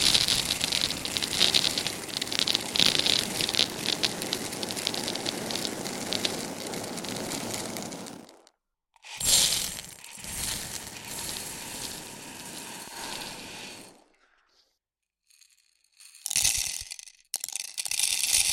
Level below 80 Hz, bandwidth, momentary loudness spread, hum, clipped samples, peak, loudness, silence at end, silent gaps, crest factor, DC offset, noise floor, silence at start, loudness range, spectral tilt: -56 dBFS; 17 kHz; 17 LU; none; under 0.1%; -2 dBFS; -27 LUFS; 0 s; none; 28 dB; under 0.1%; -87 dBFS; 0 s; 15 LU; -0.5 dB/octave